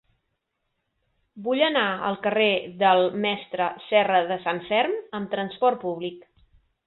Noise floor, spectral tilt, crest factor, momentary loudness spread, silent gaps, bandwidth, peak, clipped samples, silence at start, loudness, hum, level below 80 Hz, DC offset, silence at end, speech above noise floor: -78 dBFS; -9 dB/octave; 20 dB; 10 LU; none; 4.3 kHz; -6 dBFS; under 0.1%; 1.35 s; -24 LUFS; none; -68 dBFS; under 0.1%; 0.65 s; 54 dB